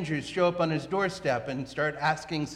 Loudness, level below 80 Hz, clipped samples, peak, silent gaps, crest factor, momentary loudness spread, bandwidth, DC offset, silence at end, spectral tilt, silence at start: -29 LUFS; -58 dBFS; under 0.1%; -12 dBFS; none; 16 dB; 5 LU; 12.5 kHz; under 0.1%; 0 s; -5.5 dB/octave; 0 s